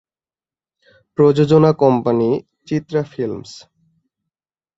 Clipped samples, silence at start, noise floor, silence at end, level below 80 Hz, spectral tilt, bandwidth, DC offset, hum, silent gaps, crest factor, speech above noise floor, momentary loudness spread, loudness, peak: under 0.1%; 1.2 s; under -90 dBFS; 1.2 s; -56 dBFS; -8.5 dB/octave; 7.8 kHz; under 0.1%; none; none; 18 dB; over 75 dB; 15 LU; -16 LUFS; -2 dBFS